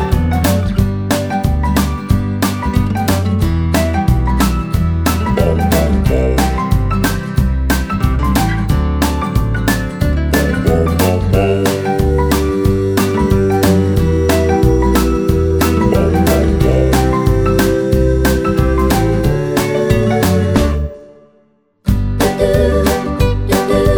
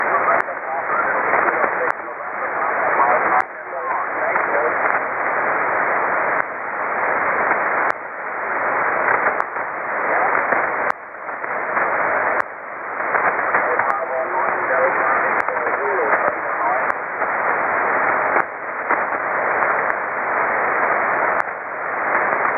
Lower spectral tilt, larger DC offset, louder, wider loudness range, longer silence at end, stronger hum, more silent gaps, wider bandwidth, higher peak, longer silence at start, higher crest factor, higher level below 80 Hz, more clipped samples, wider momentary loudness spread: about the same, -6.5 dB/octave vs -7 dB/octave; neither; first, -14 LUFS vs -19 LUFS; about the same, 3 LU vs 1 LU; about the same, 0 s vs 0 s; neither; neither; first, over 20 kHz vs 8.2 kHz; about the same, 0 dBFS vs 0 dBFS; about the same, 0 s vs 0 s; second, 12 dB vs 20 dB; first, -20 dBFS vs -62 dBFS; neither; second, 4 LU vs 7 LU